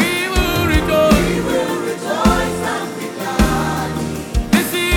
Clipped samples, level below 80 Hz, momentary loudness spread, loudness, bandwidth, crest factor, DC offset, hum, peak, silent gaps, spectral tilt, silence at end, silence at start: under 0.1%; -26 dBFS; 9 LU; -17 LUFS; 19 kHz; 16 dB; under 0.1%; none; -2 dBFS; none; -5 dB/octave; 0 s; 0 s